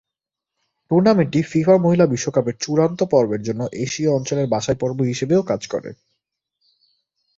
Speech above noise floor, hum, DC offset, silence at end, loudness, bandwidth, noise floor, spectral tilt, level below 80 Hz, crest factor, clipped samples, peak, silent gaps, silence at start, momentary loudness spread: 67 dB; none; under 0.1%; 1.45 s; -19 LUFS; 7.8 kHz; -85 dBFS; -6.5 dB/octave; -56 dBFS; 18 dB; under 0.1%; -2 dBFS; none; 0.9 s; 9 LU